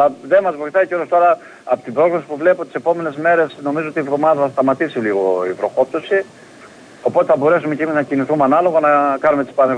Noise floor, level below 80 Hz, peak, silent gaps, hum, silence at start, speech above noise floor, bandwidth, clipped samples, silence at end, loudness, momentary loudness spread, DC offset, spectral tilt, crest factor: -41 dBFS; -66 dBFS; -2 dBFS; none; none; 0 s; 25 dB; 10 kHz; under 0.1%; 0 s; -16 LUFS; 7 LU; under 0.1%; -7 dB/octave; 14 dB